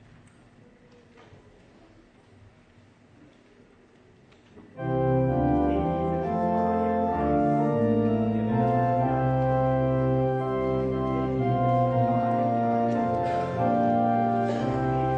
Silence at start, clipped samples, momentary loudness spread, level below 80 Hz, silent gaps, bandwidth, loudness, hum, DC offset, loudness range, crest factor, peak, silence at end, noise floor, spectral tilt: 4.55 s; under 0.1%; 3 LU; -46 dBFS; none; 7.2 kHz; -25 LUFS; none; under 0.1%; 5 LU; 14 dB; -12 dBFS; 0 s; -56 dBFS; -9.5 dB/octave